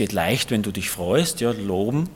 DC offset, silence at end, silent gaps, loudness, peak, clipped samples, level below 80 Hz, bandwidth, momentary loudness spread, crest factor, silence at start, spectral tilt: under 0.1%; 0 s; none; -22 LUFS; -6 dBFS; under 0.1%; -52 dBFS; 17.5 kHz; 4 LU; 16 dB; 0 s; -4.5 dB/octave